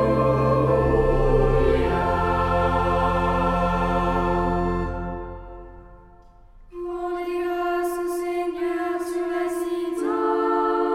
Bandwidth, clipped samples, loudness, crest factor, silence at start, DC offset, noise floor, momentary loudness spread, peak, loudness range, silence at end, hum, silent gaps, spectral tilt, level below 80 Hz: 15.5 kHz; under 0.1%; -23 LUFS; 16 dB; 0 s; under 0.1%; -48 dBFS; 11 LU; -6 dBFS; 9 LU; 0 s; none; none; -7.5 dB/octave; -32 dBFS